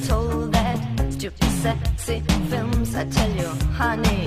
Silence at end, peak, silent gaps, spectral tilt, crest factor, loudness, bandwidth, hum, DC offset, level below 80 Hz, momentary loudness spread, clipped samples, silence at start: 0 s; -6 dBFS; none; -5.5 dB/octave; 16 dB; -23 LUFS; 15.5 kHz; none; under 0.1%; -26 dBFS; 4 LU; under 0.1%; 0 s